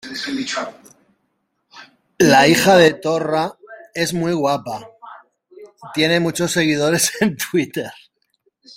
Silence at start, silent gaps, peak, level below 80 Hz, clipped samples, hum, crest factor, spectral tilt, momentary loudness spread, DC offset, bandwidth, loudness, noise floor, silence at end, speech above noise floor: 0.05 s; none; -2 dBFS; -56 dBFS; under 0.1%; none; 18 dB; -4 dB/octave; 16 LU; under 0.1%; 16.5 kHz; -17 LUFS; -70 dBFS; 0.85 s; 53 dB